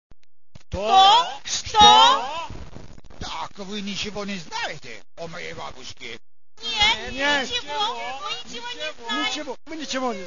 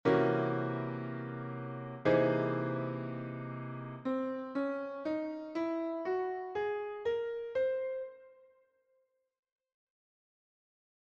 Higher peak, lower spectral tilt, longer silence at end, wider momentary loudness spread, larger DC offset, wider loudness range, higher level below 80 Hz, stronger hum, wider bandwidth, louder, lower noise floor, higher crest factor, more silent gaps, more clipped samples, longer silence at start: first, 0 dBFS vs -16 dBFS; second, -1.5 dB/octave vs -9 dB/octave; second, 0 s vs 2.75 s; first, 23 LU vs 12 LU; first, 1% vs under 0.1%; first, 14 LU vs 6 LU; first, -48 dBFS vs -72 dBFS; neither; about the same, 7.4 kHz vs 7 kHz; first, -20 LUFS vs -35 LUFS; second, -42 dBFS vs -77 dBFS; about the same, 22 dB vs 20 dB; neither; neither; about the same, 0.1 s vs 0.05 s